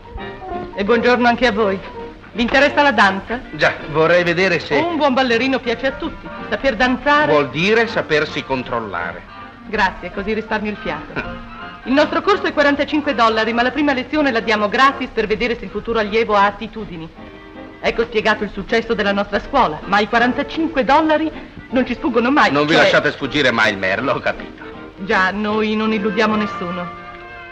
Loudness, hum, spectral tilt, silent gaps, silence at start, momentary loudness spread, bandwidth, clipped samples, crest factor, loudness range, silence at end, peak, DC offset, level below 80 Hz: -17 LUFS; none; -5 dB/octave; none; 0 s; 16 LU; 8.8 kHz; under 0.1%; 16 dB; 4 LU; 0 s; -2 dBFS; under 0.1%; -42 dBFS